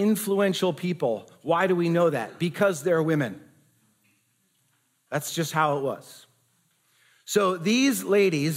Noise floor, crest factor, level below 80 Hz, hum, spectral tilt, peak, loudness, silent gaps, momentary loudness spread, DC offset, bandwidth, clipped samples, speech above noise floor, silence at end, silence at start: -69 dBFS; 16 dB; -78 dBFS; none; -5 dB/octave; -8 dBFS; -25 LUFS; none; 10 LU; under 0.1%; 16 kHz; under 0.1%; 45 dB; 0 s; 0 s